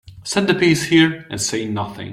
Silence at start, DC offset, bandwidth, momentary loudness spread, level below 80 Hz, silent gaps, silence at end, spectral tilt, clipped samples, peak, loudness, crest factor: 0.05 s; under 0.1%; 14.5 kHz; 10 LU; -52 dBFS; none; 0 s; -4 dB/octave; under 0.1%; -2 dBFS; -18 LUFS; 16 dB